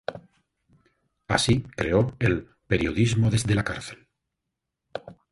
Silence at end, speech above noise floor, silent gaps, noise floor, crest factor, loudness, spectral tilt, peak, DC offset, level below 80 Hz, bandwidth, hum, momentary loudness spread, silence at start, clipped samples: 0.2 s; 60 dB; none; -84 dBFS; 22 dB; -24 LUFS; -5.5 dB/octave; -6 dBFS; under 0.1%; -44 dBFS; 11.5 kHz; none; 17 LU; 0.1 s; under 0.1%